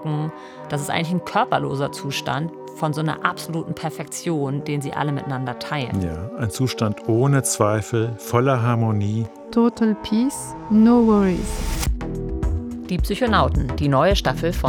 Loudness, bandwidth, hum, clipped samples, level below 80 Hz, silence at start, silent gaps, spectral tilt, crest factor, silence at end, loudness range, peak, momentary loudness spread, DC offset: -22 LUFS; 19 kHz; none; under 0.1%; -34 dBFS; 0 s; none; -6 dB/octave; 20 dB; 0 s; 6 LU; 0 dBFS; 10 LU; under 0.1%